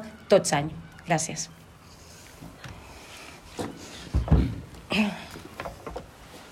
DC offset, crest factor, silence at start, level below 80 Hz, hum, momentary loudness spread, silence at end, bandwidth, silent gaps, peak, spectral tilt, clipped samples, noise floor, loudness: under 0.1%; 22 dB; 0 s; -38 dBFS; none; 23 LU; 0 s; 15.5 kHz; none; -6 dBFS; -5 dB/octave; under 0.1%; -49 dBFS; -28 LUFS